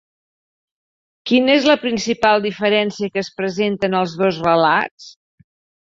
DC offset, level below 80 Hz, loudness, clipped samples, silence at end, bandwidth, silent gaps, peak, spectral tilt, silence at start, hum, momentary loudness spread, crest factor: under 0.1%; -58 dBFS; -17 LUFS; under 0.1%; 0.75 s; 7.8 kHz; 4.91-4.98 s; -2 dBFS; -5 dB/octave; 1.25 s; none; 9 LU; 18 dB